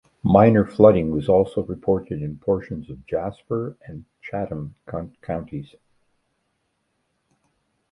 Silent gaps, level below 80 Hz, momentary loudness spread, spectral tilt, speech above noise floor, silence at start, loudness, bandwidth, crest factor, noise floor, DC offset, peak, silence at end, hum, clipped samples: none; -46 dBFS; 19 LU; -10 dB/octave; 52 dB; 0.25 s; -21 LUFS; 10.5 kHz; 22 dB; -72 dBFS; under 0.1%; 0 dBFS; 2.25 s; none; under 0.1%